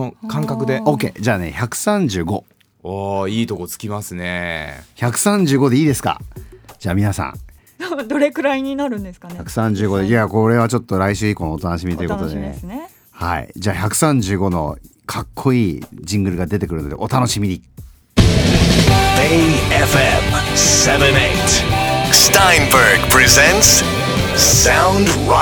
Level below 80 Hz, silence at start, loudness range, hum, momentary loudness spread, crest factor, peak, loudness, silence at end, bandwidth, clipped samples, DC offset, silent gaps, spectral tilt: -30 dBFS; 0 s; 11 LU; none; 16 LU; 16 dB; 0 dBFS; -14 LUFS; 0 s; over 20 kHz; under 0.1%; under 0.1%; none; -3.5 dB/octave